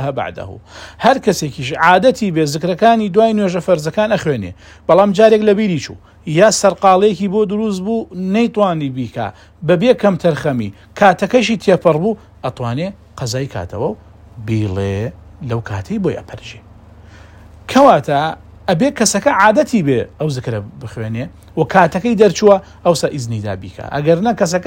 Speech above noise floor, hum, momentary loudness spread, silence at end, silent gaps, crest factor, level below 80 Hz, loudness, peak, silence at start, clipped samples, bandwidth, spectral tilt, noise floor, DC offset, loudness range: 25 dB; none; 15 LU; 0 s; none; 14 dB; -46 dBFS; -15 LUFS; 0 dBFS; 0 s; 0.2%; 16.5 kHz; -5.5 dB/octave; -40 dBFS; under 0.1%; 9 LU